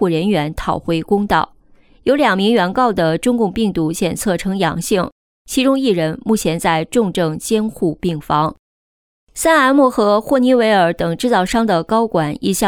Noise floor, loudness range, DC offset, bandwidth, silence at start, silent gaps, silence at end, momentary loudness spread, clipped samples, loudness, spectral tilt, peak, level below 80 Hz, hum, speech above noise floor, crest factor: under -90 dBFS; 3 LU; under 0.1%; 18.5 kHz; 0 s; 5.12-5.45 s, 8.59-9.27 s; 0 s; 7 LU; under 0.1%; -16 LUFS; -5 dB/octave; -2 dBFS; -42 dBFS; none; over 75 dB; 12 dB